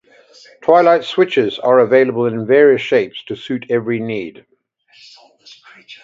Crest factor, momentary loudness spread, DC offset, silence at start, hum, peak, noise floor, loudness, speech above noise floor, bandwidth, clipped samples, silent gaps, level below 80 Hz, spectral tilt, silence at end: 16 dB; 13 LU; under 0.1%; 0.65 s; none; 0 dBFS; -54 dBFS; -14 LUFS; 40 dB; 7.6 kHz; under 0.1%; none; -64 dBFS; -6.5 dB/octave; 0.1 s